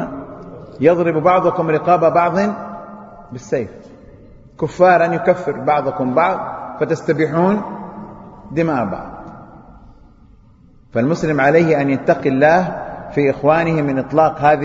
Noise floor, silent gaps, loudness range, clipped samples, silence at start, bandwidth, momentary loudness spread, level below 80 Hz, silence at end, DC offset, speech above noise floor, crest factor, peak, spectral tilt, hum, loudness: -47 dBFS; none; 7 LU; under 0.1%; 0 s; 7.8 kHz; 20 LU; -48 dBFS; 0 s; under 0.1%; 32 dB; 16 dB; 0 dBFS; -7.5 dB/octave; none; -16 LUFS